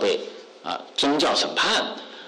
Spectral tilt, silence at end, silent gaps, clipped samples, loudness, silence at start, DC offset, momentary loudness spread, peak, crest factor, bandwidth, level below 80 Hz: -2 dB/octave; 0 s; none; under 0.1%; -23 LUFS; 0 s; under 0.1%; 13 LU; -14 dBFS; 10 dB; 13 kHz; -62 dBFS